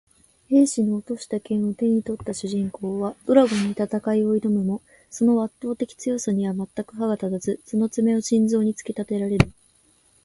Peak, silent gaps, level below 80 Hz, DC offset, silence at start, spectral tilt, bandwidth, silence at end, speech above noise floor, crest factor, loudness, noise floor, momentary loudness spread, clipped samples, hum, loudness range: 0 dBFS; none; -50 dBFS; under 0.1%; 0.5 s; -6.5 dB/octave; 11.5 kHz; 0.75 s; 38 dB; 22 dB; -23 LUFS; -60 dBFS; 10 LU; under 0.1%; none; 2 LU